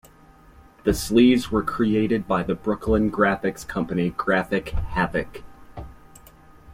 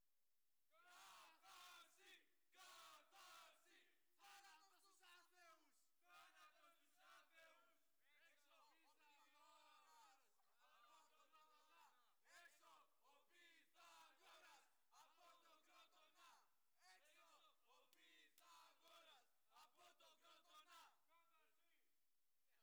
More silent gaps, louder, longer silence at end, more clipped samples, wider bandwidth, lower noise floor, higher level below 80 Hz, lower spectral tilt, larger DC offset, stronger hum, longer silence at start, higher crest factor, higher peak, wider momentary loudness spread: neither; first, -22 LUFS vs -67 LUFS; about the same, 0 s vs 0 s; neither; second, 16.5 kHz vs over 20 kHz; second, -51 dBFS vs under -90 dBFS; first, -38 dBFS vs under -90 dBFS; first, -6 dB/octave vs 0.5 dB/octave; neither; neither; first, 0.85 s vs 0 s; about the same, 18 dB vs 20 dB; first, -4 dBFS vs -54 dBFS; first, 18 LU vs 5 LU